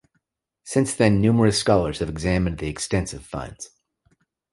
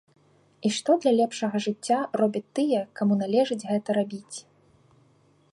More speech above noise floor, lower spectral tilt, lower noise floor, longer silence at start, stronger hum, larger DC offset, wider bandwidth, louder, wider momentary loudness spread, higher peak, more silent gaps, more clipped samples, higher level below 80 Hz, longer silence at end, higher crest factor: first, 52 dB vs 37 dB; about the same, -5.5 dB/octave vs -5.5 dB/octave; first, -73 dBFS vs -61 dBFS; about the same, 0.65 s vs 0.6 s; neither; neither; about the same, 11.5 kHz vs 11.5 kHz; first, -22 LUFS vs -25 LUFS; first, 16 LU vs 8 LU; first, -2 dBFS vs -10 dBFS; neither; neither; first, -40 dBFS vs -76 dBFS; second, 0.85 s vs 1.1 s; about the same, 20 dB vs 18 dB